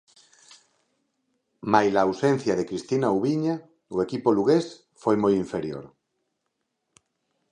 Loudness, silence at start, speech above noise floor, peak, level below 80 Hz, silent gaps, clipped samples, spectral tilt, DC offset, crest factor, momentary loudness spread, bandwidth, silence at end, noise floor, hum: -24 LUFS; 1.65 s; 55 dB; -4 dBFS; -62 dBFS; none; under 0.1%; -6.5 dB/octave; under 0.1%; 22 dB; 13 LU; 10 kHz; 1.65 s; -79 dBFS; none